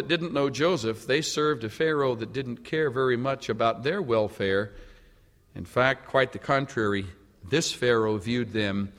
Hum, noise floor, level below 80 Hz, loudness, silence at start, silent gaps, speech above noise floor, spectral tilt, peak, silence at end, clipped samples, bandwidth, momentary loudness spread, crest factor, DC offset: none; -58 dBFS; -56 dBFS; -26 LUFS; 0 s; none; 31 dB; -5 dB/octave; -6 dBFS; 0.1 s; under 0.1%; 15.5 kHz; 7 LU; 20 dB; under 0.1%